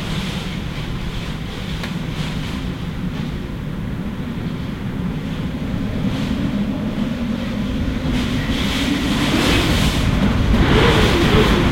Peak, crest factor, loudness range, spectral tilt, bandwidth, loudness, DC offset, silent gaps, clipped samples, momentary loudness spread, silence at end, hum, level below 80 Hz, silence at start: -2 dBFS; 16 dB; 9 LU; -5.5 dB/octave; 16.5 kHz; -20 LUFS; under 0.1%; none; under 0.1%; 12 LU; 0 s; none; -26 dBFS; 0 s